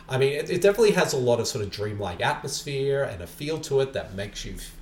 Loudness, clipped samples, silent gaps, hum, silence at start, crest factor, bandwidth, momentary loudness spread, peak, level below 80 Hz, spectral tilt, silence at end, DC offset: -25 LUFS; under 0.1%; none; none; 0 s; 18 dB; 17.5 kHz; 13 LU; -8 dBFS; -48 dBFS; -4.5 dB/octave; 0 s; under 0.1%